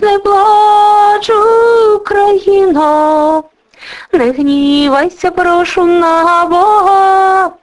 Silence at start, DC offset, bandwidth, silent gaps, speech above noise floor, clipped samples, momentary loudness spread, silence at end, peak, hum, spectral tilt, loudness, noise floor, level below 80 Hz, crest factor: 0 s; under 0.1%; 11.5 kHz; none; 23 dB; 0.1%; 6 LU; 0.1 s; 0 dBFS; none; -4 dB/octave; -9 LUFS; -32 dBFS; -44 dBFS; 8 dB